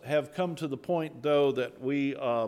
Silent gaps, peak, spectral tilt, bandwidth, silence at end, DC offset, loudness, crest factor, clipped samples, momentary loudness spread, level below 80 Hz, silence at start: none; -16 dBFS; -7 dB/octave; 14 kHz; 0 s; under 0.1%; -30 LUFS; 14 dB; under 0.1%; 7 LU; -74 dBFS; 0.05 s